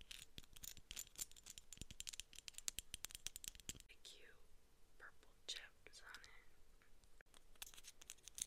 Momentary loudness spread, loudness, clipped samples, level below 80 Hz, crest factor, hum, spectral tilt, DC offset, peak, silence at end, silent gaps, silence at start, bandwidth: 14 LU; -54 LUFS; under 0.1%; -68 dBFS; 38 dB; none; 0 dB/octave; under 0.1%; -20 dBFS; 0 s; 7.21-7.26 s; 0 s; 16 kHz